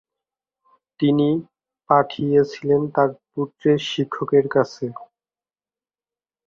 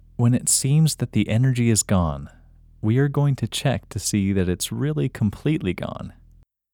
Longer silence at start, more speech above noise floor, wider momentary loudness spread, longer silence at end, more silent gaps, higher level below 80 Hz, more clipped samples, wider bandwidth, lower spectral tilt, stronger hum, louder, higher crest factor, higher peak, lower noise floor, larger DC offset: first, 1 s vs 0.2 s; first, over 70 dB vs 33 dB; about the same, 11 LU vs 9 LU; first, 1.4 s vs 0.65 s; neither; second, -62 dBFS vs -44 dBFS; neither; second, 7.2 kHz vs 18.5 kHz; first, -7 dB/octave vs -5 dB/octave; neither; about the same, -21 LUFS vs -22 LUFS; about the same, 20 dB vs 16 dB; first, -2 dBFS vs -6 dBFS; first, under -90 dBFS vs -54 dBFS; neither